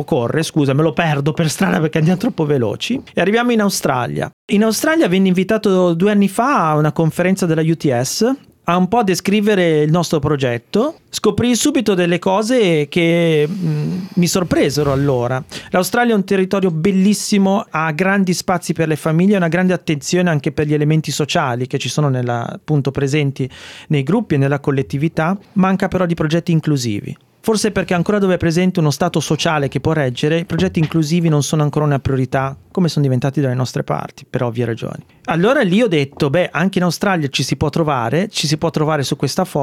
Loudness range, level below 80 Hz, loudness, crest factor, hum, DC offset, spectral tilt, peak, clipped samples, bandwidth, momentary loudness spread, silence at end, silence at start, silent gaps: 3 LU; -48 dBFS; -16 LUFS; 14 dB; none; under 0.1%; -5.5 dB/octave; -2 dBFS; under 0.1%; 16 kHz; 6 LU; 0 s; 0 s; 4.33-4.48 s